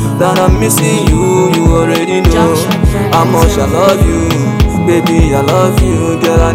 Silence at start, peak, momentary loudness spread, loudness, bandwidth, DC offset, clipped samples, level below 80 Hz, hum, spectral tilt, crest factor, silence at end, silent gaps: 0 s; 0 dBFS; 3 LU; -10 LUFS; 16.5 kHz; under 0.1%; 1%; -16 dBFS; none; -5.5 dB/octave; 8 dB; 0 s; none